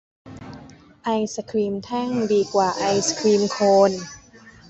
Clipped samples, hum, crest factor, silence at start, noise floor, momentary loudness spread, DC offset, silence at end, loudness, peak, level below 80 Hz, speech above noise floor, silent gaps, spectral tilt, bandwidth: under 0.1%; none; 18 dB; 0.25 s; -47 dBFS; 21 LU; under 0.1%; 0.2 s; -21 LUFS; -4 dBFS; -58 dBFS; 27 dB; none; -4.5 dB/octave; 8.2 kHz